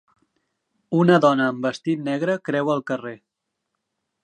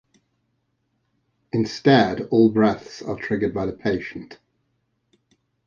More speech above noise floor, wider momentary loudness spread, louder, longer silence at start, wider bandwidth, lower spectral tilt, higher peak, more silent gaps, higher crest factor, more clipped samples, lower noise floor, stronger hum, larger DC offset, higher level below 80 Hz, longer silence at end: first, 59 dB vs 51 dB; about the same, 12 LU vs 14 LU; about the same, -21 LUFS vs -21 LUFS; second, 0.9 s vs 1.55 s; first, 9.4 kHz vs 7.2 kHz; about the same, -7 dB/octave vs -7 dB/octave; about the same, -4 dBFS vs -2 dBFS; neither; about the same, 20 dB vs 22 dB; neither; first, -79 dBFS vs -72 dBFS; neither; neither; second, -74 dBFS vs -54 dBFS; second, 1.1 s vs 1.35 s